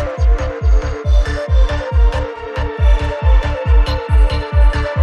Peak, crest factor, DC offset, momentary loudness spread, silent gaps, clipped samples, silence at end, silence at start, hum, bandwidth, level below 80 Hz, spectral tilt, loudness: -2 dBFS; 10 dB; under 0.1%; 3 LU; none; under 0.1%; 0 s; 0 s; none; 7 kHz; -14 dBFS; -6.5 dB/octave; -16 LUFS